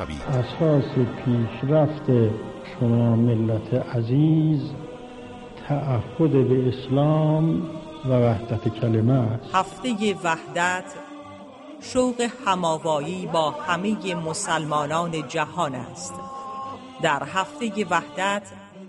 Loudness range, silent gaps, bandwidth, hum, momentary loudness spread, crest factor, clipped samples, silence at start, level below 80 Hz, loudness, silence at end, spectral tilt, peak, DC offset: 5 LU; none; 11.5 kHz; none; 15 LU; 16 dB; under 0.1%; 0 s; -52 dBFS; -23 LUFS; 0 s; -6.5 dB/octave; -6 dBFS; under 0.1%